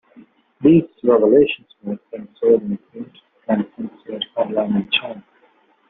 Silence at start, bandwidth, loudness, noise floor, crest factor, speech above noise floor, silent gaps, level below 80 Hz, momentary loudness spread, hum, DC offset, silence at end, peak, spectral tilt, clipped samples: 0.6 s; 4.1 kHz; -18 LUFS; -57 dBFS; 16 dB; 39 dB; none; -58 dBFS; 21 LU; none; under 0.1%; 0.7 s; -2 dBFS; -5 dB/octave; under 0.1%